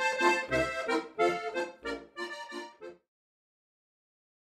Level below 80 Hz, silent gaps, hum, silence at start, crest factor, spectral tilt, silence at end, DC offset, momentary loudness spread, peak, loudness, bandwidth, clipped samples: -60 dBFS; none; none; 0 s; 20 dB; -3.5 dB/octave; 1.55 s; under 0.1%; 17 LU; -14 dBFS; -31 LUFS; 14.5 kHz; under 0.1%